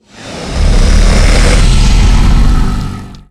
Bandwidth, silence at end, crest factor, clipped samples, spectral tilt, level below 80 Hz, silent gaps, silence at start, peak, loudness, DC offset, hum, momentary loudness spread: 11.5 kHz; 0.1 s; 8 dB; under 0.1%; -5 dB/octave; -8 dBFS; none; 0.2 s; 0 dBFS; -11 LUFS; under 0.1%; none; 13 LU